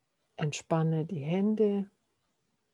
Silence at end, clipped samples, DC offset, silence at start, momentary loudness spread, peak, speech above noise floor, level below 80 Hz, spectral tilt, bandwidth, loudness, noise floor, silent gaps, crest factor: 0.85 s; under 0.1%; under 0.1%; 0.4 s; 8 LU; -14 dBFS; 49 dB; -78 dBFS; -7 dB/octave; 11 kHz; -31 LUFS; -78 dBFS; none; 18 dB